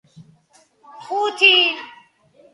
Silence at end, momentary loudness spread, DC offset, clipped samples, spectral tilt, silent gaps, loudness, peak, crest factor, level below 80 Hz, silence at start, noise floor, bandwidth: 0.65 s; 16 LU; under 0.1%; under 0.1%; -1.5 dB/octave; none; -15 LUFS; -2 dBFS; 20 dB; -78 dBFS; 0.2 s; -57 dBFS; 11.5 kHz